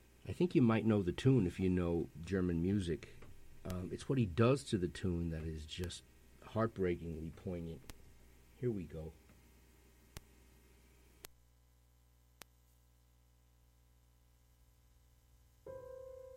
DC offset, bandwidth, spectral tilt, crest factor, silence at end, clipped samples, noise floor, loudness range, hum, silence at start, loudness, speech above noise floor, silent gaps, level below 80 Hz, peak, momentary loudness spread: under 0.1%; 16.5 kHz; -7.5 dB/octave; 22 dB; 0 s; under 0.1%; -69 dBFS; 14 LU; 60 Hz at -60 dBFS; 0.25 s; -37 LUFS; 33 dB; none; -58 dBFS; -18 dBFS; 24 LU